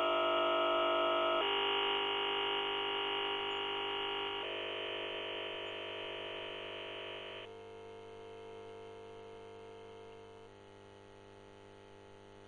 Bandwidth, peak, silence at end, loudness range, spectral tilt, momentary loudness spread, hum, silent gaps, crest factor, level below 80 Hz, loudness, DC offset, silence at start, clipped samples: 10 kHz; -22 dBFS; 0 s; 20 LU; -4 dB/octave; 25 LU; none; none; 16 dB; -74 dBFS; -35 LUFS; under 0.1%; 0 s; under 0.1%